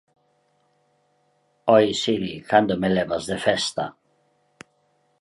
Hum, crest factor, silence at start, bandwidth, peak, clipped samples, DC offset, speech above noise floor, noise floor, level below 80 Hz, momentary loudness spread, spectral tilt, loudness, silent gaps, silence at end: none; 22 dB; 1.65 s; 11.5 kHz; -2 dBFS; under 0.1%; under 0.1%; 45 dB; -66 dBFS; -58 dBFS; 10 LU; -4.5 dB/octave; -22 LUFS; none; 1.3 s